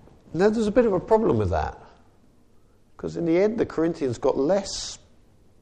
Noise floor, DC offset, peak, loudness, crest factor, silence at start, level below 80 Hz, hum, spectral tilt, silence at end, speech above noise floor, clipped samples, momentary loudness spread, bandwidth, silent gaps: -56 dBFS; under 0.1%; -6 dBFS; -24 LUFS; 18 dB; 0.3 s; -46 dBFS; none; -6 dB/octave; 0.65 s; 33 dB; under 0.1%; 13 LU; 9.8 kHz; none